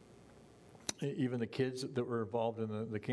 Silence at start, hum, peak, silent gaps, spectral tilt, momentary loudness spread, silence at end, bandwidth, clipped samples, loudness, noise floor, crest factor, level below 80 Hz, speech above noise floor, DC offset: 0 s; none; -18 dBFS; none; -5.5 dB/octave; 4 LU; 0 s; 11 kHz; under 0.1%; -38 LUFS; -60 dBFS; 20 dB; -76 dBFS; 22 dB; under 0.1%